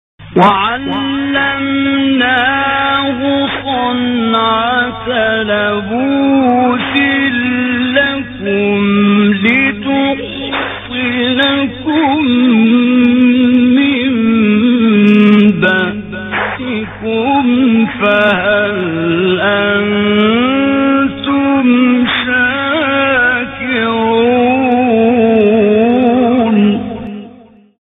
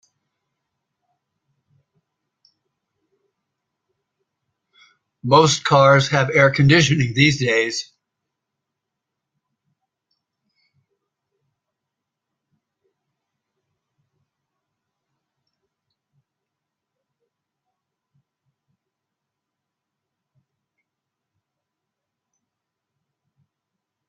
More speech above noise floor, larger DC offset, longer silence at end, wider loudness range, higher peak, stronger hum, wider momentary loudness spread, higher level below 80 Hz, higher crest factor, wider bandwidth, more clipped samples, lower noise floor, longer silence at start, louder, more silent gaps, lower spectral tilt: second, 28 dB vs 68 dB; neither; second, 0.5 s vs 16.25 s; second, 3 LU vs 9 LU; about the same, 0 dBFS vs -2 dBFS; neither; about the same, 7 LU vs 8 LU; first, -44 dBFS vs -58 dBFS; second, 12 dB vs 24 dB; second, 3.9 kHz vs 9 kHz; neither; second, -40 dBFS vs -83 dBFS; second, 0.2 s vs 5.25 s; first, -11 LUFS vs -15 LUFS; neither; first, -8 dB/octave vs -5 dB/octave